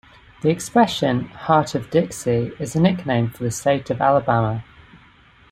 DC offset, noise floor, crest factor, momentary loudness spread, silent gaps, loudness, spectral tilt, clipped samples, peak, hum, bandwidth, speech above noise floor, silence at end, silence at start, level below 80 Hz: under 0.1%; -51 dBFS; 20 dB; 6 LU; none; -20 LUFS; -6 dB/octave; under 0.1%; -2 dBFS; none; 16 kHz; 31 dB; 0.55 s; 0.45 s; -50 dBFS